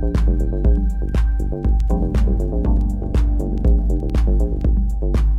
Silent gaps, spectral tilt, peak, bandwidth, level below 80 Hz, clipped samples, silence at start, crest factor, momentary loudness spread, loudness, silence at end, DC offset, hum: none; -9 dB/octave; -6 dBFS; 3.8 kHz; -18 dBFS; under 0.1%; 0 s; 10 dB; 2 LU; -20 LUFS; 0 s; under 0.1%; none